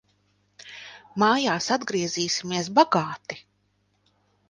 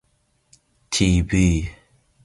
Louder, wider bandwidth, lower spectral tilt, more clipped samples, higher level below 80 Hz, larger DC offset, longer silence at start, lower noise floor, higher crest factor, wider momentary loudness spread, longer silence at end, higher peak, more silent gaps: second, -23 LUFS vs -20 LUFS; about the same, 10.5 kHz vs 11.5 kHz; second, -3.5 dB/octave vs -5 dB/octave; neither; second, -68 dBFS vs -32 dBFS; neither; second, 0.65 s vs 0.9 s; about the same, -69 dBFS vs -66 dBFS; about the same, 22 dB vs 18 dB; first, 20 LU vs 8 LU; first, 1.1 s vs 0.55 s; about the same, -4 dBFS vs -4 dBFS; neither